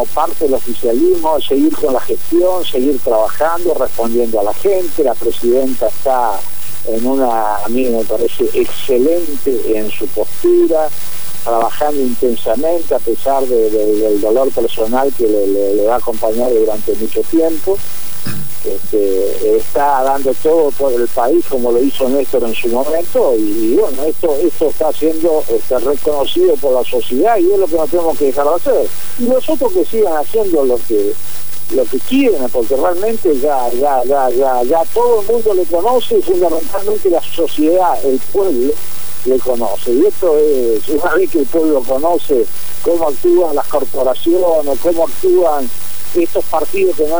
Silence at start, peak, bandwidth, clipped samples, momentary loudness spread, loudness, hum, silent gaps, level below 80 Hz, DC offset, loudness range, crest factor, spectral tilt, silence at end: 0 s; -2 dBFS; over 20 kHz; under 0.1%; 4 LU; -14 LUFS; none; none; -40 dBFS; 20%; 2 LU; 12 dB; -5 dB/octave; 0 s